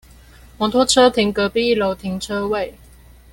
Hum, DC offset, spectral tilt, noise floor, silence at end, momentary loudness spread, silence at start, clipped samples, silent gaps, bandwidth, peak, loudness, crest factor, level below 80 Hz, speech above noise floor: none; under 0.1%; -3.5 dB/octave; -45 dBFS; 0.6 s; 11 LU; 0.6 s; under 0.1%; none; 17 kHz; -2 dBFS; -18 LUFS; 18 dB; -44 dBFS; 28 dB